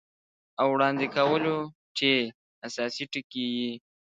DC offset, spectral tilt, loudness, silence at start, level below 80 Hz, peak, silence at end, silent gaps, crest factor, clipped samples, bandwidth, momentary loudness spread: under 0.1%; -4.5 dB/octave; -27 LUFS; 0.6 s; -72 dBFS; -8 dBFS; 0.4 s; 1.75-1.95 s, 2.35-2.62 s, 3.24-3.30 s; 20 dB; under 0.1%; 9.2 kHz; 13 LU